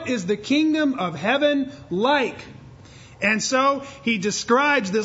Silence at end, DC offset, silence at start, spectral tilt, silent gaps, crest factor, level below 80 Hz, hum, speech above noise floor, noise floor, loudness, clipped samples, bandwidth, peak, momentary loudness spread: 0 s; under 0.1%; 0 s; -4 dB/octave; none; 16 dB; -58 dBFS; none; 23 dB; -45 dBFS; -21 LUFS; under 0.1%; 8 kHz; -6 dBFS; 7 LU